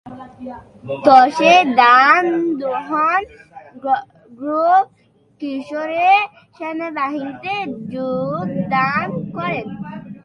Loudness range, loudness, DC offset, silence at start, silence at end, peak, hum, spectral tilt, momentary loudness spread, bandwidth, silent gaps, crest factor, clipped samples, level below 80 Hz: 8 LU; -16 LUFS; under 0.1%; 0.05 s; 0.05 s; 0 dBFS; none; -5.5 dB/octave; 20 LU; 10.5 kHz; none; 18 dB; under 0.1%; -58 dBFS